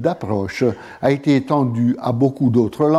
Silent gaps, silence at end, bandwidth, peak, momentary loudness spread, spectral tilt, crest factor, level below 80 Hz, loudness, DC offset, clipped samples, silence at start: none; 0 s; 12.5 kHz; -4 dBFS; 5 LU; -8 dB/octave; 14 dB; -54 dBFS; -18 LUFS; under 0.1%; under 0.1%; 0 s